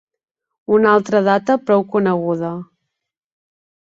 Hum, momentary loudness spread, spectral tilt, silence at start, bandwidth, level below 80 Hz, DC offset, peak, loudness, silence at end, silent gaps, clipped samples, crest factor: none; 12 LU; -7 dB/octave; 0.7 s; 7.6 kHz; -62 dBFS; under 0.1%; -2 dBFS; -16 LUFS; 1.35 s; none; under 0.1%; 16 dB